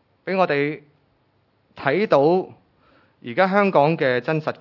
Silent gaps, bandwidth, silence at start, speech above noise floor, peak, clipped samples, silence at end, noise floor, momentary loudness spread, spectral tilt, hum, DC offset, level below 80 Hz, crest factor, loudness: none; 6 kHz; 0.25 s; 44 dB; -2 dBFS; under 0.1%; 0.05 s; -64 dBFS; 12 LU; -8 dB/octave; none; under 0.1%; -70 dBFS; 18 dB; -20 LUFS